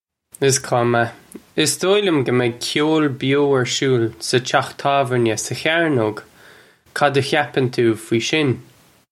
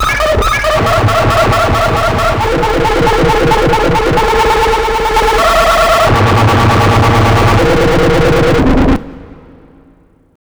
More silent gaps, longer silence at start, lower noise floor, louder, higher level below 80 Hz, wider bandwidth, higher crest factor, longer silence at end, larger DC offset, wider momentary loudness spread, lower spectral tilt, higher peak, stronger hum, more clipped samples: neither; first, 0.4 s vs 0 s; about the same, -48 dBFS vs -46 dBFS; second, -18 LUFS vs -10 LUFS; second, -60 dBFS vs -20 dBFS; second, 15 kHz vs over 20 kHz; first, 18 dB vs 10 dB; second, 0.5 s vs 1.25 s; neither; about the same, 4 LU vs 3 LU; about the same, -4.5 dB/octave vs -5.5 dB/octave; about the same, 0 dBFS vs 0 dBFS; neither; neither